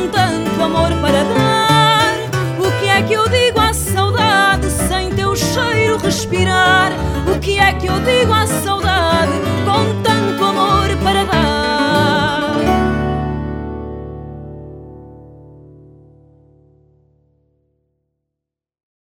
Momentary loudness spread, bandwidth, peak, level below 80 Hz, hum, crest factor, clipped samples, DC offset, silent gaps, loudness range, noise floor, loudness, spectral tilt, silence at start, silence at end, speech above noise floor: 11 LU; over 20 kHz; 0 dBFS; -30 dBFS; none; 14 dB; under 0.1%; under 0.1%; none; 8 LU; -82 dBFS; -14 LUFS; -4.5 dB/octave; 0 s; 3.6 s; 68 dB